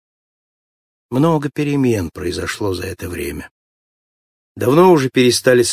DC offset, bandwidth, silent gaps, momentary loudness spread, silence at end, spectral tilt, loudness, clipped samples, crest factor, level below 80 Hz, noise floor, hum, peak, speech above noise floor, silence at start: under 0.1%; 15.5 kHz; 3.51-4.55 s; 14 LU; 0 s; -5 dB/octave; -16 LUFS; under 0.1%; 16 dB; -42 dBFS; under -90 dBFS; none; 0 dBFS; over 75 dB; 1.1 s